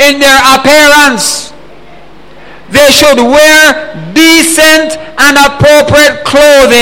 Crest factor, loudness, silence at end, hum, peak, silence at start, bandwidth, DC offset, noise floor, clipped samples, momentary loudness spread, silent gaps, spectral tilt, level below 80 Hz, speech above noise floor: 6 dB; -3 LUFS; 0 s; none; 0 dBFS; 0 s; over 20 kHz; 3%; -33 dBFS; 5%; 8 LU; none; -2.5 dB/octave; -32 dBFS; 29 dB